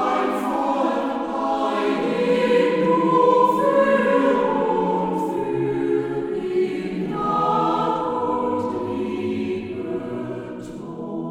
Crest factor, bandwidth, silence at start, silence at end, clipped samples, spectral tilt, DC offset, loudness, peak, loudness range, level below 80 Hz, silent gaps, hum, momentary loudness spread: 16 dB; 14.5 kHz; 0 s; 0 s; under 0.1%; -7 dB/octave; under 0.1%; -21 LUFS; -6 dBFS; 6 LU; -54 dBFS; none; none; 11 LU